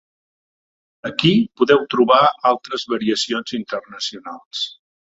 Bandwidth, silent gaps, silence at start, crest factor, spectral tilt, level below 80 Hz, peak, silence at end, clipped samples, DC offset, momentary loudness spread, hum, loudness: 8 kHz; 4.45-4.51 s; 1.05 s; 20 dB; -5 dB/octave; -60 dBFS; 0 dBFS; 0.4 s; under 0.1%; under 0.1%; 14 LU; none; -18 LUFS